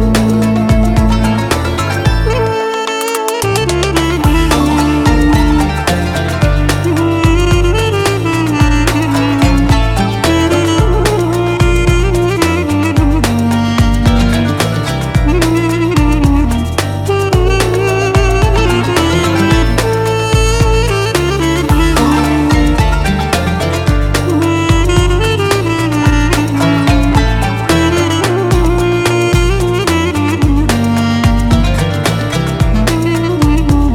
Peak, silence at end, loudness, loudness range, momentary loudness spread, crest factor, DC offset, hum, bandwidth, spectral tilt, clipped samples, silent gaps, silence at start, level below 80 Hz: 0 dBFS; 0 s; -12 LUFS; 1 LU; 3 LU; 10 dB; under 0.1%; none; 17 kHz; -5.5 dB/octave; under 0.1%; none; 0 s; -16 dBFS